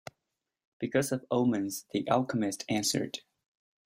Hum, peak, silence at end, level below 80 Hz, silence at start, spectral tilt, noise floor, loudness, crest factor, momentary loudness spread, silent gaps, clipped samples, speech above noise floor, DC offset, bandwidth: none; -12 dBFS; 0.65 s; -70 dBFS; 0.8 s; -4.5 dB/octave; -86 dBFS; -31 LUFS; 20 dB; 10 LU; none; under 0.1%; 56 dB; under 0.1%; 16 kHz